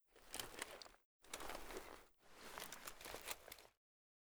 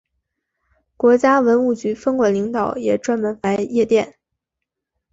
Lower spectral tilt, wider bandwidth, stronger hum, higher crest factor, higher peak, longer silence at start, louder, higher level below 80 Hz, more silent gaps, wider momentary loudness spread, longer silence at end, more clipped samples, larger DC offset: second, -1 dB/octave vs -6 dB/octave; first, over 20 kHz vs 8 kHz; neither; first, 28 dB vs 16 dB; second, -26 dBFS vs -4 dBFS; second, 0.1 s vs 1 s; second, -53 LUFS vs -18 LUFS; second, -68 dBFS vs -58 dBFS; first, 1.05-1.19 s vs none; first, 10 LU vs 7 LU; second, 0.55 s vs 1.05 s; neither; neither